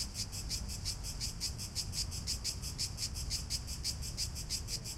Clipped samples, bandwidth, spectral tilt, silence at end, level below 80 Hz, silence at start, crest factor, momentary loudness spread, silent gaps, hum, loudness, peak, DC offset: under 0.1%; 16 kHz; -2 dB/octave; 0 s; -46 dBFS; 0 s; 18 dB; 2 LU; none; none; -38 LUFS; -22 dBFS; under 0.1%